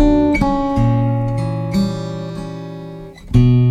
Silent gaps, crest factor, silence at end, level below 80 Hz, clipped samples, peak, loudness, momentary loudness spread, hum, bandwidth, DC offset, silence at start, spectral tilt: none; 14 dB; 0 s; -28 dBFS; under 0.1%; -2 dBFS; -17 LUFS; 17 LU; none; 9.6 kHz; under 0.1%; 0 s; -8.5 dB/octave